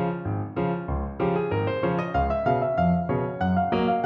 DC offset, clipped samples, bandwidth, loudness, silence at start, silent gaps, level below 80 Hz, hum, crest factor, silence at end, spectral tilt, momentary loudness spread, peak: under 0.1%; under 0.1%; 5.6 kHz; -25 LUFS; 0 s; none; -40 dBFS; none; 14 dB; 0 s; -9.5 dB/octave; 5 LU; -10 dBFS